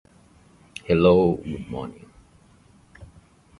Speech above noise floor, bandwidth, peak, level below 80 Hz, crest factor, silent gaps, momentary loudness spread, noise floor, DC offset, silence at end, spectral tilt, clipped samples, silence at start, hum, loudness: 34 dB; 11.5 kHz; -6 dBFS; -46 dBFS; 20 dB; none; 22 LU; -55 dBFS; under 0.1%; 0.55 s; -8 dB/octave; under 0.1%; 0.9 s; none; -21 LUFS